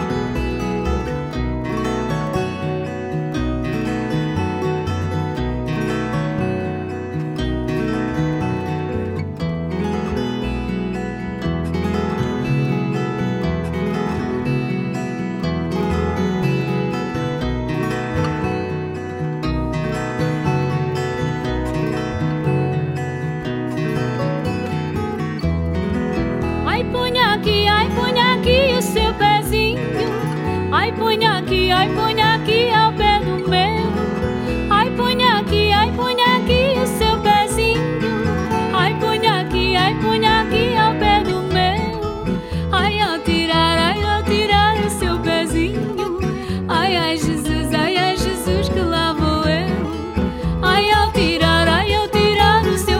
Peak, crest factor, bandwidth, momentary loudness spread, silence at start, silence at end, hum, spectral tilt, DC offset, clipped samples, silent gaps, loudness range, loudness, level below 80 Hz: 0 dBFS; 18 dB; 16.5 kHz; 9 LU; 0 s; 0 s; none; -5.5 dB/octave; under 0.1%; under 0.1%; none; 6 LU; -19 LUFS; -32 dBFS